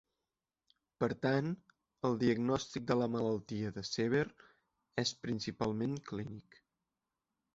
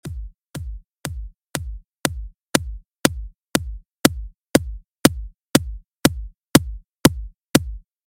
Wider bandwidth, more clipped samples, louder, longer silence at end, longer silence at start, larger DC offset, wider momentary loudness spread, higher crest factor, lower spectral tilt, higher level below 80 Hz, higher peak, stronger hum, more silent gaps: second, 8 kHz vs 16.5 kHz; neither; second, -36 LUFS vs -21 LUFS; first, 1.15 s vs 0.25 s; first, 1 s vs 0.05 s; neither; second, 10 LU vs 18 LU; about the same, 20 dB vs 24 dB; about the same, -5 dB/octave vs -4 dB/octave; second, -66 dBFS vs -34 dBFS; second, -16 dBFS vs 0 dBFS; neither; second, none vs 6.89-6.93 s